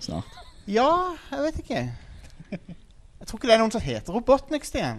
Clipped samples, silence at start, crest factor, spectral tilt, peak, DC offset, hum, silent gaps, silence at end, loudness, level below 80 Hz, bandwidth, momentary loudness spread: under 0.1%; 0 s; 22 dB; -5 dB/octave; -4 dBFS; under 0.1%; none; none; 0 s; -25 LUFS; -44 dBFS; 13 kHz; 20 LU